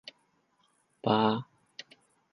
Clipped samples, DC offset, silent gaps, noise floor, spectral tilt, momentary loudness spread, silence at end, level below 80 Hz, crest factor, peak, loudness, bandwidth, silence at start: under 0.1%; under 0.1%; none; -71 dBFS; -7 dB/octave; 22 LU; 0.9 s; -74 dBFS; 24 dB; -10 dBFS; -29 LUFS; 10.5 kHz; 1.05 s